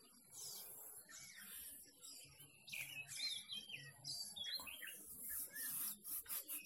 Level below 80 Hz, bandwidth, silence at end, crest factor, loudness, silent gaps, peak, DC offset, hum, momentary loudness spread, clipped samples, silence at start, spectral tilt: -82 dBFS; 17 kHz; 0 s; 20 dB; -48 LUFS; none; -32 dBFS; under 0.1%; none; 12 LU; under 0.1%; 0 s; 0.5 dB/octave